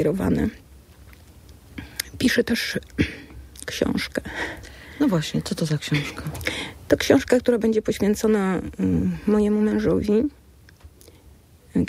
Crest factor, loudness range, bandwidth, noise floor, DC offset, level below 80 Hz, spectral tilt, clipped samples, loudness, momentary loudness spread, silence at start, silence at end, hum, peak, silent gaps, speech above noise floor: 20 dB; 5 LU; 16 kHz; -50 dBFS; under 0.1%; -44 dBFS; -5.5 dB/octave; under 0.1%; -23 LUFS; 12 LU; 0 s; 0 s; none; -4 dBFS; none; 29 dB